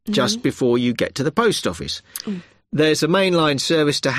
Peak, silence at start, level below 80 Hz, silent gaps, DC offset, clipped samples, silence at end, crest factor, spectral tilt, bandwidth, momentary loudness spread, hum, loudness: -6 dBFS; 0.05 s; -52 dBFS; none; under 0.1%; under 0.1%; 0 s; 14 dB; -4.5 dB/octave; 15 kHz; 11 LU; none; -19 LUFS